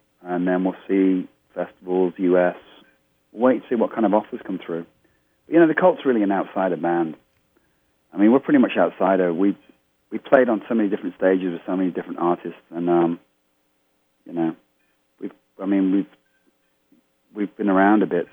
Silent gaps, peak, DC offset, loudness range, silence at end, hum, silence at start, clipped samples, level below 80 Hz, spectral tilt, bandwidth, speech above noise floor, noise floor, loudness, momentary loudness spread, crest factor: none; 0 dBFS; under 0.1%; 7 LU; 0.1 s; none; 0.25 s; under 0.1%; -74 dBFS; -9.5 dB/octave; 3.7 kHz; 48 dB; -68 dBFS; -21 LUFS; 16 LU; 22 dB